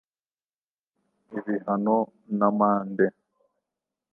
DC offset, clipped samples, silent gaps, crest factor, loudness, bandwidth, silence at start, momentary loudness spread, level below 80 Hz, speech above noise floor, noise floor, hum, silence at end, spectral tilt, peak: under 0.1%; under 0.1%; none; 22 dB; -25 LUFS; 2.4 kHz; 1.3 s; 9 LU; -78 dBFS; over 65 dB; under -90 dBFS; none; 1.05 s; -12 dB/octave; -6 dBFS